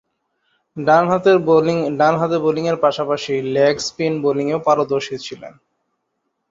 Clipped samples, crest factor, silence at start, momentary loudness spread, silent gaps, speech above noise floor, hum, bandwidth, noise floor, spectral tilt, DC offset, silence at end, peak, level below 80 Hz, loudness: under 0.1%; 16 dB; 0.75 s; 10 LU; none; 56 dB; none; 7.8 kHz; -73 dBFS; -5.5 dB/octave; under 0.1%; 1 s; -2 dBFS; -60 dBFS; -17 LUFS